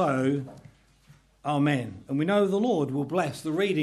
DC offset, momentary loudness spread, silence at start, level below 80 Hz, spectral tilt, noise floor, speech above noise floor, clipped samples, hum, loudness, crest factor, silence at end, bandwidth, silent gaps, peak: under 0.1%; 8 LU; 0 s; -64 dBFS; -7 dB/octave; -58 dBFS; 32 dB; under 0.1%; none; -27 LUFS; 16 dB; 0 s; 13.5 kHz; none; -12 dBFS